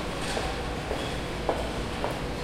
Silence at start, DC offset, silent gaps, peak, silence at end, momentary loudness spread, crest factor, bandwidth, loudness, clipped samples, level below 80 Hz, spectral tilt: 0 s; under 0.1%; none; -10 dBFS; 0 s; 2 LU; 20 dB; 16.5 kHz; -31 LUFS; under 0.1%; -38 dBFS; -4.5 dB/octave